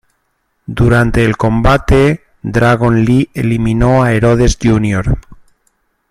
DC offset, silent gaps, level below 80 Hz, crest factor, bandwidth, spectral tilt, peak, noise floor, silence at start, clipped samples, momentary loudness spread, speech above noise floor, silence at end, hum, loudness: under 0.1%; none; -24 dBFS; 12 dB; 12.5 kHz; -7 dB/octave; 0 dBFS; -64 dBFS; 0.7 s; under 0.1%; 7 LU; 53 dB; 0.75 s; none; -12 LUFS